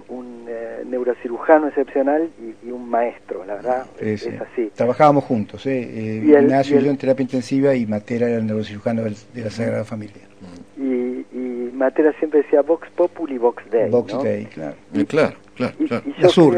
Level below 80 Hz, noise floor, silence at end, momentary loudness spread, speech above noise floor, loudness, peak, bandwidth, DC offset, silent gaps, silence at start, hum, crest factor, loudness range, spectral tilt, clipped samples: -60 dBFS; -40 dBFS; 0 s; 15 LU; 22 dB; -20 LUFS; 0 dBFS; 10 kHz; 0.3%; none; 0.1 s; none; 20 dB; 6 LU; -7 dB/octave; under 0.1%